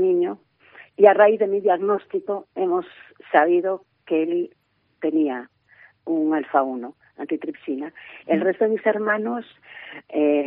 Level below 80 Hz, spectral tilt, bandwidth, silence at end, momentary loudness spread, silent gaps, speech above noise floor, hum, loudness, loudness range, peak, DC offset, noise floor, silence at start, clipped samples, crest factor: -78 dBFS; -4.5 dB/octave; 4 kHz; 0 s; 21 LU; none; 33 dB; none; -22 LUFS; 6 LU; 0 dBFS; under 0.1%; -54 dBFS; 0 s; under 0.1%; 22 dB